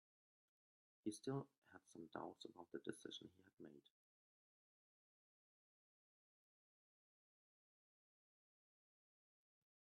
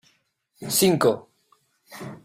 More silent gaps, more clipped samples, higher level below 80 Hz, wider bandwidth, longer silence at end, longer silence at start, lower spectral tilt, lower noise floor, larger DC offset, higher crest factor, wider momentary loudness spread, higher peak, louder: first, 1.58-1.62 s vs none; neither; second, under -90 dBFS vs -62 dBFS; second, 10.5 kHz vs 16 kHz; first, 6.15 s vs 0.1 s; first, 1.05 s vs 0.6 s; first, -5.5 dB/octave vs -4 dB/octave; first, under -90 dBFS vs -68 dBFS; neither; first, 28 dB vs 18 dB; second, 15 LU vs 21 LU; second, -32 dBFS vs -8 dBFS; second, -54 LUFS vs -21 LUFS